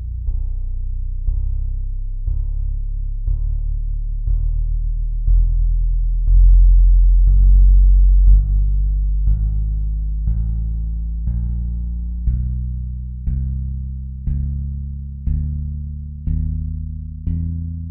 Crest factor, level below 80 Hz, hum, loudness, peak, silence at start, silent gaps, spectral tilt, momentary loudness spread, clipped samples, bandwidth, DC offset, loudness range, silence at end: 14 dB; -16 dBFS; none; -21 LUFS; -2 dBFS; 0 s; none; -14.5 dB/octave; 13 LU; under 0.1%; 0.5 kHz; under 0.1%; 10 LU; 0 s